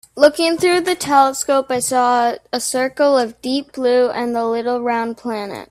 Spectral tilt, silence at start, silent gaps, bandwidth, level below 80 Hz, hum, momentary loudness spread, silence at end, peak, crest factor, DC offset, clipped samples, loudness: -2.5 dB/octave; 0.15 s; none; 16 kHz; -60 dBFS; none; 8 LU; 0.05 s; 0 dBFS; 16 dB; under 0.1%; under 0.1%; -17 LUFS